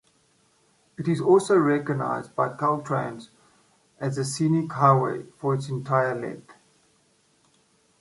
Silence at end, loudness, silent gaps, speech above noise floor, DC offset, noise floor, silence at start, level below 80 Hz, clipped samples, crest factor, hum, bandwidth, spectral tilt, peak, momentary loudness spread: 1.5 s; -24 LUFS; none; 41 dB; under 0.1%; -64 dBFS; 1 s; -68 dBFS; under 0.1%; 22 dB; none; 11.5 kHz; -6.5 dB/octave; -4 dBFS; 13 LU